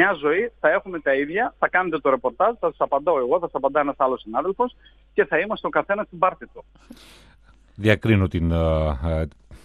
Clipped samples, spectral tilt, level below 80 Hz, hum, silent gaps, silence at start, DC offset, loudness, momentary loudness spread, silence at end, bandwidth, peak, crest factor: under 0.1%; -8 dB/octave; -38 dBFS; none; none; 0 s; under 0.1%; -22 LUFS; 6 LU; 0.05 s; 13 kHz; -4 dBFS; 18 dB